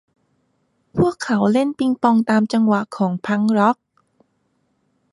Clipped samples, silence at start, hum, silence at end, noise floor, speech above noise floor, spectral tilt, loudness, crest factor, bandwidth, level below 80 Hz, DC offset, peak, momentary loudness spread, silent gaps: under 0.1%; 0.95 s; none; 1.4 s; -67 dBFS; 49 dB; -7 dB/octave; -18 LUFS; 18 dB; 11.5 kHz; -56 dBFS; under 0.1%; -2 dBFS; 6 LU; none